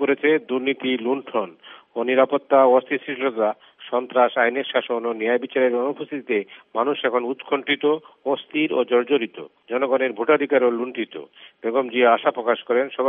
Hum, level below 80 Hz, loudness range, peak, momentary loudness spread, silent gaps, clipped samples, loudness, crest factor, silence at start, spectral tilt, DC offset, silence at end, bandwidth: none; -82 dBFS; 3 LU; -4 dBFS; 10 LU; none; under 0.1%; -21 LUFS; 18 dB; 0 s; -1.5 dB/octave; under 0.1%; 0 s; 3.8 kHz